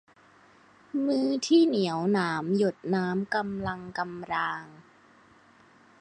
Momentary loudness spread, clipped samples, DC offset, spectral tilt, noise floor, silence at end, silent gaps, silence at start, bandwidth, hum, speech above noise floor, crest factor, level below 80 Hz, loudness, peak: 12 LU; under 0.1%; under 0.1%; -5.5 dB/octave; -58 dBFS; 1.2 s; none; 0.95 s; 9.8 kHz; none; 31 dB; 18 dB; -64 dBFS; -28 LUFS; -10 dBFS